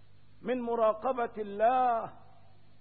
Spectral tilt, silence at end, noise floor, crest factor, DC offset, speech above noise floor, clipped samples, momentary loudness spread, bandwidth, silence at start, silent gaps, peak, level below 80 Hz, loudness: -9 dB/octave; 0.65 s; -61 dBFS; 16 dB; 0.3%; 31 dB; under 0.1%; 10 LU; 4.3 kHz; 0.4 s; none; -16 dBFS; -68 dBFS; -30 LUFS